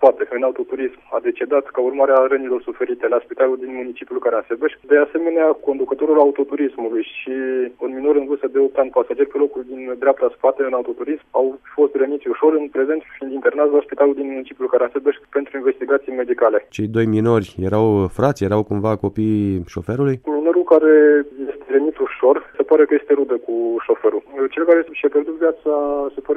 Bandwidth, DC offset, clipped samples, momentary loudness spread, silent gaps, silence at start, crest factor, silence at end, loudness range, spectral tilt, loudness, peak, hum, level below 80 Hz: 7 kHz; under 0.1%; under 0.1%; 9 LU; none; 0 s; 16 dB; 0 s; 3 LU; -8.5 dB/octave; -18 LUFS; 0 dBFS; none; -54 dBFS